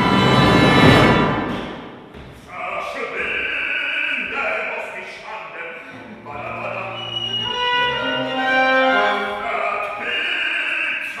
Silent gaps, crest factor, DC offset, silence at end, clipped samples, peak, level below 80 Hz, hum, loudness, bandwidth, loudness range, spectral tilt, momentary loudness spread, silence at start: none; 20 dB; under 0.1%; 0 s; under 0.1%; 0 dBFS; -42 dBFS; none; -18 LUFS; 15 kHz; 8 LU; -5.5 dB/octave; 19 LU; 0 s